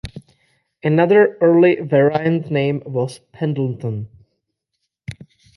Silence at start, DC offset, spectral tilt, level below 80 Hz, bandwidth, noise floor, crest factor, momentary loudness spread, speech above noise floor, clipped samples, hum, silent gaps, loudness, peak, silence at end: 0.05 s; under 0.1%; -8.5 dB/octave; -52 dBFS; 11.5 kHz; -76 dBFS; 16 dB; 23 LU; 60 dB; under 0.1%; none; none; -17 LUFS; -2 dBFS; 0.45 s